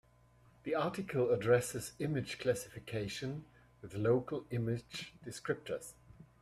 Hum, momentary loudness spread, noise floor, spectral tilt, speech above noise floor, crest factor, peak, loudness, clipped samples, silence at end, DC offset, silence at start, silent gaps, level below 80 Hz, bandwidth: none; 15 LU; -66 dBFS; -5.5 dB/octave; 29 dB; 22 dB; -16 dBFS; -37 LUFS; under 0.1%; 0.15 s; under 0.1%; 0.65 s; none; -66 dBFS; 15.5 kHz